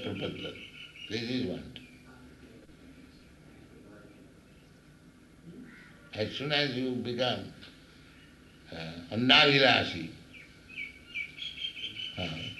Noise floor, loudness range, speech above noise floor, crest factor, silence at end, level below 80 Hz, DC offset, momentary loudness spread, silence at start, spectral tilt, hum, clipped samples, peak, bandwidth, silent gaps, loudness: -56 dBFS; 14 LU; 27 dB; 26 dB; 0 s; -62 dBFS; under 0.1%; 28 LU; 0 s; -4.5 dB/octave; none; under 0.1%; -6 dBFS; 12 kHz; none; -29 LUFS